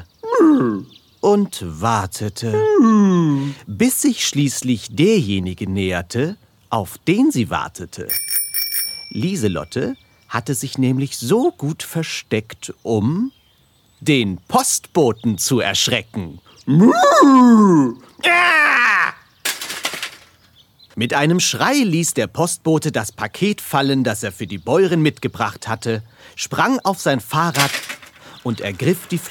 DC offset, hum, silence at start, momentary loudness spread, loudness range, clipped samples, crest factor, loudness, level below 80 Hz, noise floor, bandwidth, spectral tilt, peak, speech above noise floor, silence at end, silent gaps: under 0.1%; none; 0 s; 13 LU; 8 LU; under 0.1%; 18 dB; -17 LUFS; -54 dBFS; -56 dBFS; 19 kHz; -4.5 dB/octave; 0 dBFS; 39 dB; 0 s; none